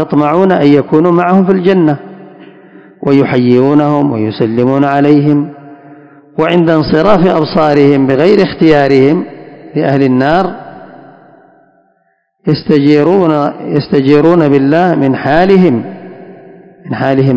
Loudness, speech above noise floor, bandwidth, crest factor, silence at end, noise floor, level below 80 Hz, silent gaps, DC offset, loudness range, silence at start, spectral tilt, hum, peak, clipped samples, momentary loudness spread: -9 LUFS; 50 dB; 8 kHz; 10 dB; 0 s; -58 dBFS; -44 dBFS; none; under 0.1%; 5 LU; 0 s; -9 dB/octave; none; 0 dBFS; 2%; 8 LU